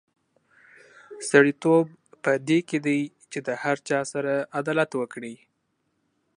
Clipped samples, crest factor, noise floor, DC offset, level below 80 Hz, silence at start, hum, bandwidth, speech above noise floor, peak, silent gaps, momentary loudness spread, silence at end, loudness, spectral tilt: under 0.1%; 24 dB; -74 dBFS; under 0.1%; -78 dBFS; 1.1 s; none; 11 kHz; 50 dB; -2 dBFS; none; 14 LU; 1 s; -24 LUFS; -5.5 dB/octave